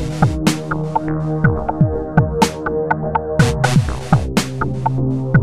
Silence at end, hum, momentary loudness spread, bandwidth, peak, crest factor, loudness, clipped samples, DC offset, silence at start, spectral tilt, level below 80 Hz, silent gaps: 0 s; none; 5 LU; 15 kHz; 0 dBFS; 16 dB; -18 LUFS; under 0.1%; 2%; 0 s; -6.5 dB/octave; -30 dBFS; none